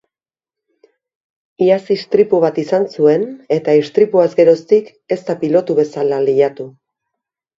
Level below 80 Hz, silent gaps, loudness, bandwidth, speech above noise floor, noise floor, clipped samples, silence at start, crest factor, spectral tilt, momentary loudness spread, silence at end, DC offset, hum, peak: -64 dBFS; none; -14 LUFS; 7.6 kHz; 76 dB; -89 dBFS; under 0.1%; 1.6 s; 16 dB; -7.5 dB/octave; 7 LU; 0.9 s; under 0.1%; none; 0 dBFS